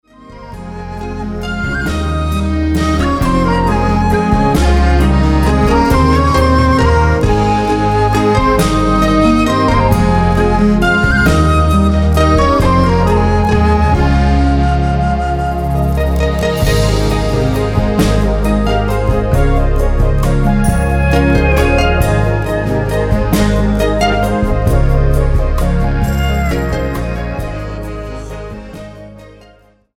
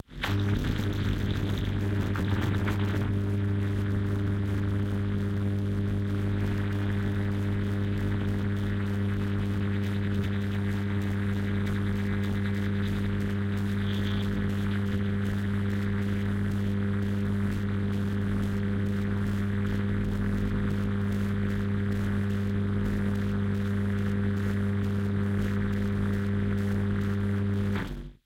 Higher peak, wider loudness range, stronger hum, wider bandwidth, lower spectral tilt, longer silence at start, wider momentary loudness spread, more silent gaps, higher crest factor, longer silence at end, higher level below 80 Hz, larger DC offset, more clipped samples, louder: first, 0 dBFS vs -16 dBFS; first, 5 LU vs 1 LU; neither; first, 16.5 kHz vs 13.5 kHz; second, -6.5 dB/octave vs -8 dB/octave; first, 0.3 s vs 0.1 s; first, 9 LU vs 1 LU; neither; about the same, 12 dB vs 12 dB; first, 0.7 s vs 0.1 s; first, -16 dBFS vs -42 dBFS; neither; neither; first, -13 LUFS vs -29 LUFS